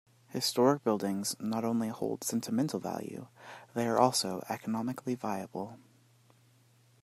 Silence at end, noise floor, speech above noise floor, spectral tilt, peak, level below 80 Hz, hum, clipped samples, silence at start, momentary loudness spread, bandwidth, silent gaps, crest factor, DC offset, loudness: 1.25 s; -65 dBFS; 32 dB; -4.5 dB/octave; -10 dBFS; -78 dBFS; none; under 0.1%; 0.3 s; 15 LU; 15.5 kHz; none; 24 dB; under 0.1%; -32 LUFS